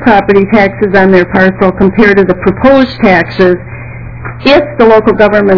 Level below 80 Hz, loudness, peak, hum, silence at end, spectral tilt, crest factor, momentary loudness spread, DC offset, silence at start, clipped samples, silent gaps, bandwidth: -30 dBFS; -7 LUFS; 0 dBFS; none; 0 s; -8 dB/octave; 6 dB; 10 LU; 1%; 0 s; 10%; none; 5.4 kHz